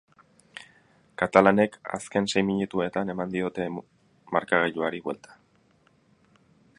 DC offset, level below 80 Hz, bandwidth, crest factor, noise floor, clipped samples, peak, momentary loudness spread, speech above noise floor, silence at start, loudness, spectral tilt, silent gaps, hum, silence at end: under 0.1%; -62 dBFS; 11 kHz; 28 dB; -63 dBFS; under 0.1%; 0 dBFS; 22 LU; 38 dB; 0.55 s; -26 LUFS; -5.5 dB/octave; none; none; 1.65 s